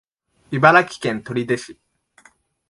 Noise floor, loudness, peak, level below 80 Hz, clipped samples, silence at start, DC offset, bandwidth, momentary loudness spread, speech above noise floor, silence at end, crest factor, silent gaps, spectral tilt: -55 dBFS; -18 LUFS; 0 dBFS; -62 dBFS; under 0.1%; 0.5 s; under 0.1%; 11.5 kHz; 14 LU; 37 dB; 0.95 s; 20 dB; none; -5.5 dB/octave